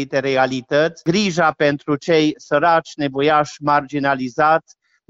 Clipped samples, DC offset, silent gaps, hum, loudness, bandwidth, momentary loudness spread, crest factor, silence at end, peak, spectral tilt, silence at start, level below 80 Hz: under 0.1%; under 0.1%; none; none; -18 LUFS; 8 kHz; 4 LU; 14 dB; 0.5 s; -4 dBFS; -5 dB/octave; 0 s; -56 dBFS